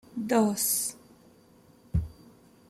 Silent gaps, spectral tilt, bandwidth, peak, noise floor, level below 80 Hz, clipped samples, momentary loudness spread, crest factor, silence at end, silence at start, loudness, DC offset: none; -4.5 dB/octave; 16 kHz; -12 dBFS; -58 dBFS; -46 dBFS; under 0.1%; 9 LU; 20 dB; 0.55 s; 0.15 s; -28 LUFS; under 0.1%